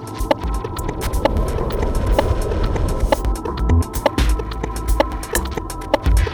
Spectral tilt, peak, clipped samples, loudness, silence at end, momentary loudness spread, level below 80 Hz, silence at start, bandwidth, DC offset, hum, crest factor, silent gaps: -5.5 dB/octave; 0 dBFS; under 0.1%; -21 LUFS; 0 s; 6 LU; -22 dBFS; 0 s; 20 kHz; under 0.1%; none; 18 dB; none